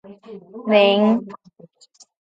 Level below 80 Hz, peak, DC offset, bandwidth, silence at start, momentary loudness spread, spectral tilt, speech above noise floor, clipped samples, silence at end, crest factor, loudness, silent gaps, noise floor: -68 dBFS; -4 dBFS; under 0.1%; 7.8 kHz; 0.1 s; 25 LU; -6.5 dB/octave; 36 dB; under 0.1%; 0.9 s; 18 dB; -17 LUFS; none; -53 dBFS